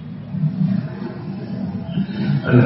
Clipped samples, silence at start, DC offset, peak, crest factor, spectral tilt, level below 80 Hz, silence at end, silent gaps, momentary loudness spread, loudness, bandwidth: under 0.1%; 0 s; under 0.1%; 0 dBFS; 20 dB; -8 dB/octave; -52 dBFS; 0 s; none; 9 LU; -23 LUFS; 5.8 kHz